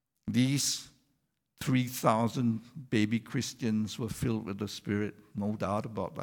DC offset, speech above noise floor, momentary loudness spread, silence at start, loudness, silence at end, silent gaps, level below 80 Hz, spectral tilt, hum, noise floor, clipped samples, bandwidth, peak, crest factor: under 0.1%; 47 dB; 9 LU; 0.25 s; -32 LUFS; 0 s; none; -60 dBFS; -5 dB/octave; none; -78 dBFS; under 0.1%; 19 kHz; -12 dBFS; 20 dB